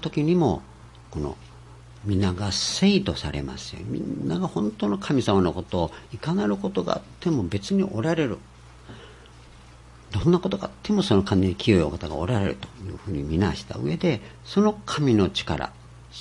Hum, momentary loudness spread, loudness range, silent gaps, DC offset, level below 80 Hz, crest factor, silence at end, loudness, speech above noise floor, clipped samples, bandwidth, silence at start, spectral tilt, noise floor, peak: none; 13 LU; 3 LU; none; under 0.1%; -46 dBFS; 20 dB; 0 s; -25 LUFS; 23 dB; under 0.1%; 11.5 kHz; 0 s; -6 dB/octave; -47 dBFS; -4 dBFS